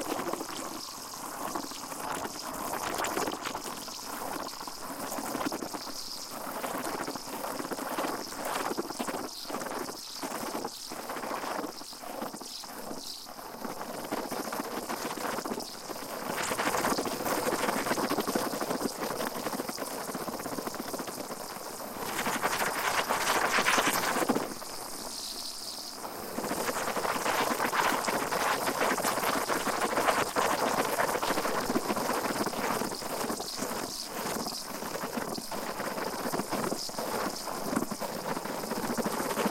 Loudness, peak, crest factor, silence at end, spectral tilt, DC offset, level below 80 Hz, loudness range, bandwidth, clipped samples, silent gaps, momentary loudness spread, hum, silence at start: -32 LUFS; -10 dBFS; 22 dB; 0 s; -2.5 dB/octave; under 0.1%; -60 dBFS; 8 LU; 17 kHz; under 0.1%; none; 10 LU; none; 0 s